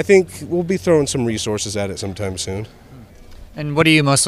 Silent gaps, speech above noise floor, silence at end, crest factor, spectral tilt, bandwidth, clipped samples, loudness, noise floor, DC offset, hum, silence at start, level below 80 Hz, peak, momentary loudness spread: none; 23 dB; 0 s; 16 dB; -4.5 dB/octave; 15 kHz; under 0.1%; -18 LUFS; -40 dBFS; under 0.1%; none; 0 s; -44 dBFS; -2 dBFS; 15 LU